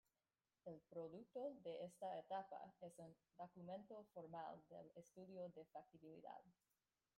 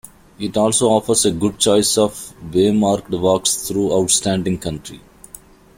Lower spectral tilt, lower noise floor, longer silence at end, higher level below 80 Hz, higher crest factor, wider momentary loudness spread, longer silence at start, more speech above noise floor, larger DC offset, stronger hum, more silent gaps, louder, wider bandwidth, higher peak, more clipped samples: first, -6.5 dB/octave vs -4 dB/octave; first, under -90 dBFS vs -43 dBFS; first, 0.65 s vs 0.4 s; second, under -90 dBFS vs -46 dBFS; about the same, 18 dB vs 16 dB; about the same, 11 LU vs 11 LU; first, 0.65 s vs 0.4 s; first, over 34 dB vs 26 dB; neither; neither; neither; second, -57 LUFS vs -17 LUFS; about the same, 16 kHz vs 16.5 kHz; second, -38 dBFS vs -2 dBFS; neither